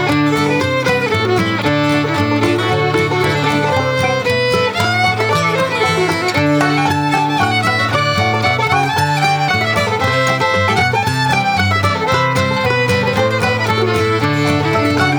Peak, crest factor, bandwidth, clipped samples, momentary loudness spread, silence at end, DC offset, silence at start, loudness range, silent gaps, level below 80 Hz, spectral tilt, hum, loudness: 0 dBFS; 14 dB; over 20 kHz; under 0.1%; 1 LU; 0 s; under 0.1%; 0 s; 1 LU; none; -46 dBFS; -5 dB/octave; none; -14 LUFS